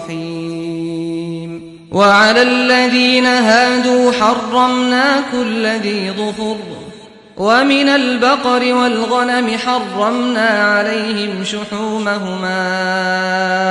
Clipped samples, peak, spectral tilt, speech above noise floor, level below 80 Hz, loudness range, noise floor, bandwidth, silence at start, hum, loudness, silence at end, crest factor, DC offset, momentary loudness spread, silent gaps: under 0.1%; 0 dBFS; -4 dB/octave; 23 dB; -56 dBFS; 5 LU; -37 dBFS; 11 kHz; 0 s; none; -14 LUFS; 0 s; 14 dB; under 0.1%; 12 LU; none